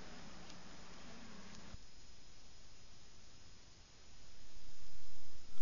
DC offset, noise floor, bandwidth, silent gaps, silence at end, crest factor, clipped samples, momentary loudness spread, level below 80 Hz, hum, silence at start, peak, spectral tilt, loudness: under 0.1%; -61 dBFS; 7.2 kHz; none; 0 s; 16 dB; under 0.1%; 6 LU; -64 dBFS; none; 0 s; -22 dBFS; -3.5 dB/octave; -59 LUFS